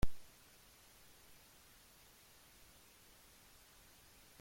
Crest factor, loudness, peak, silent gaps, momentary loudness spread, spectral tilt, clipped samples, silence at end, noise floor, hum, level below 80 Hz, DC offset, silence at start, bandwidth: 24 dB; -60 LUFS; -20 dBFS; none; 0 LU; -4.5 dB/octave; under 0.1%; 0 s; -64 dBFS; none; -54 dBFS; under 0.1%; 0 s; 16.5 kHz